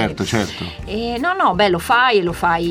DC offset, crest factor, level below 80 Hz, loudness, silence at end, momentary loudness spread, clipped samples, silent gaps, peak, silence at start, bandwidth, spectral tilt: under 0.1%; 16 dB; -40 dBFS; -17 LUFS; 0 s; 11 LU; under 0.1%; none; -2 dBFS; 0 s; 16.5 kHz; -4.5 dB/octave